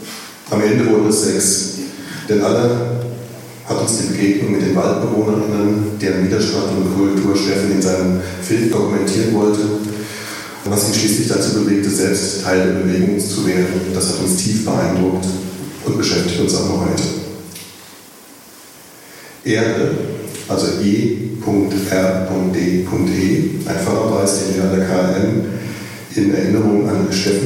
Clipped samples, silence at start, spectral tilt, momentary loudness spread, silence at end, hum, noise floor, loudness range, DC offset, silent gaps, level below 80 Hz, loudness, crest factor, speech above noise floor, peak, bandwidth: under 0.1%; 0 s; -5 dB/octave; 11 LU; 0 s; none; -40 dBFS; 4 LU; under 0.1%; none; -52 dBFS; -16 LUFS; 14 dB; 25 dB; -2 dBFS; 17 kHz